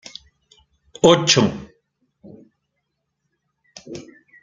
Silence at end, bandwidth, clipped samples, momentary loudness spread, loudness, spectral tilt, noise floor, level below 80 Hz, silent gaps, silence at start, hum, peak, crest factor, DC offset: 0.4 s; 9.6 kHz; under 0.1%; 25 LU; -16 LUFS; -4 dB/octave; -76 dBFS; -56 dBFS; none; 1.05 s; none; 0 dBFS; 22 dB; under 0.1%